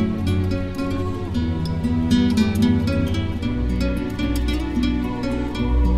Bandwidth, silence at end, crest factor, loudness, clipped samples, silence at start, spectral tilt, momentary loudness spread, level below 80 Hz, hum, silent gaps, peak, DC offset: 15 kHz; 0 s; 14 dB; -22 LUFS; under 0.1%; 0 s; -7 dB/octave; 6 LU; -26 dBFS; none; none; -6 dBFS; under 0.1%